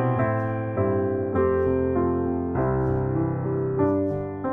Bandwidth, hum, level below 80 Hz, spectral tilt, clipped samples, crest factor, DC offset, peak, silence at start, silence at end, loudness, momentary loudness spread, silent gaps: 3.4 kHz; none; -42 dBFS; -12 dB/octave; under 0.1%; 14 dB; 0.1%; -10 dBFS; 0 s; 0 s; -24 LUFS; 3 LU; none